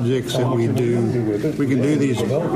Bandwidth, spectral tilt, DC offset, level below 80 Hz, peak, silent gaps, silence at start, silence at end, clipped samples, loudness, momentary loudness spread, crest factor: 15.5 kHz; -7 dB/octave; under 0.1%; -50 dBFS; -8 dBFS; none; 0 s; 0 s; under 0.1%; -20 LUFS; 3 LU; 10 dB